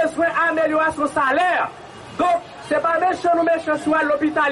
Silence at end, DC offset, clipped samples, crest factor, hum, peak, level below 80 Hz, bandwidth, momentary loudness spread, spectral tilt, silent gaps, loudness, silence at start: 0 s; under 0.1%; under 0.1%; 10 dB; none; -8 dBFS; -56 dBFS; 11.5 kHz; 6 LU; -4.5 dB/octave; none; -19 LUFS; 0 s